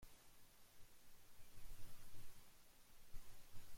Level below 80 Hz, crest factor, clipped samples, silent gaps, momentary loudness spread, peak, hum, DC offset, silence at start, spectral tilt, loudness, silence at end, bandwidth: -62 dBFS; 12 dB; under 0.1%; none; 5 LU; -38 dBFS; none; under 0.1%; 0 s; -3 dB/octave; -67 LUFS; 0 s; 16.5 kHz